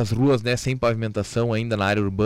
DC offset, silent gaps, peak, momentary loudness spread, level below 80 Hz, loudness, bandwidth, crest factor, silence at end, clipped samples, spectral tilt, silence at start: under 0.1%; none; -10 dBFS; 5 LU; -46 dBFS; -22 LUFS; 14 kHz; 12 dB; 0 s; under 0.1%; -6 dB/octave; 0 s